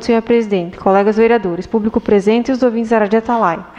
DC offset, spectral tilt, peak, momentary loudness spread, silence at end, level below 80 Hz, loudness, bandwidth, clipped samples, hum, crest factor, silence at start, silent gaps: under 0.1%; -7 dB/octave; -2 dBFS; 5 LU; 0.1 s; -44 dBFS; -14 LUFS; 8.8 kHz; under 0.1%; none; 12 dB; 0 s; none